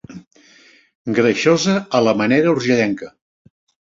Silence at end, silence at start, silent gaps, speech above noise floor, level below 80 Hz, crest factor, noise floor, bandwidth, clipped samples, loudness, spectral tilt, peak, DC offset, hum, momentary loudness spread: 0.85 s; 0.1 s; 0.27-0.31 s, 0.95-1.05 s; 34 dB; -58 dBFS; 16 dB; -50 dBFS; 7.8 kHz; under 0.1%; -16 LUFS; -5 dB/octave; -2 dBFS; under 0.1%; none; 12 LU